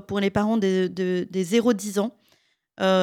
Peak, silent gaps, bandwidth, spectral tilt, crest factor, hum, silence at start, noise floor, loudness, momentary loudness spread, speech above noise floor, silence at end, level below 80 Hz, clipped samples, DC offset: -8 dBFS; none; 16 kHz; -5.5 dB/octave; 14 dB; none; 0.1 s; -65 dBFS; -24 LUFS; 5 LU; 42 dB; 0 s; -58 dBFS; under 0.1%; under 0.1%